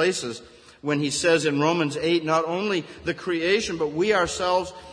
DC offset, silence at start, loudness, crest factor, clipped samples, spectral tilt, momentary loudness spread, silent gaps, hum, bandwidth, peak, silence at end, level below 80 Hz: under 0.1%; 0 s; -23 LUFS; 18 dB; under 0.1%; -4 dB/octave; 9 LU; none; none; 10.5 kHz; -6 dBFS; 0 s; -54 dBFS